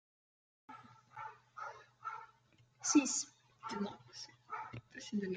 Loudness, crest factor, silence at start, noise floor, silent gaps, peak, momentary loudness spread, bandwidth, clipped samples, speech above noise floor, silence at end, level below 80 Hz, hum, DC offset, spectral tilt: -40 LUFS; 24 dB; 0.7 s; -70 dBFS; none; -18 dBFS; 24 LU; 9.6 kHz; under 0.1%; 34 dB; 0 s; -82 dBFS; none; under 0.1%; -3 dB/octave